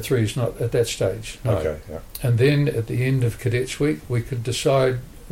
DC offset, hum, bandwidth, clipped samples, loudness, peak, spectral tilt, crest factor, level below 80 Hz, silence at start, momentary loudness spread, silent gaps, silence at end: under 0.1%; none; 16.5 kHz; under 0.1%; -22 LUFS; -8 dBFS; -6 dB/octave; 14 dB; -42 dBFS; 0 s; 9 LU; none; 0 s